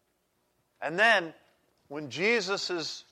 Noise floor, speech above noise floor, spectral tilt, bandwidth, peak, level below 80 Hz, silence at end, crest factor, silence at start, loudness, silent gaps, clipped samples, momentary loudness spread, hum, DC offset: -74 dBFS; 46 dB; -3 dB/octave; 13.5 kHz; -10 dBFS; -84 dBFS; 0.1 s; 22 dB; 0.8 s; -27 LUFS; none; under 0.1%; 19 LU; none; under 0.1%